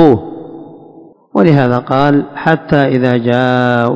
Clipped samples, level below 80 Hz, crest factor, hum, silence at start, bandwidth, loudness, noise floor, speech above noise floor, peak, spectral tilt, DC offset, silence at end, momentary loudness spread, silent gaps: 1%; -44 dBFS; 12 dB; none; 0 s; 8 kHz; -12 LUFS; -39 dBFS; 28 dB; 0 dBFS; -9 dB/octave; under 0.1%; 0 s; 17 LU; none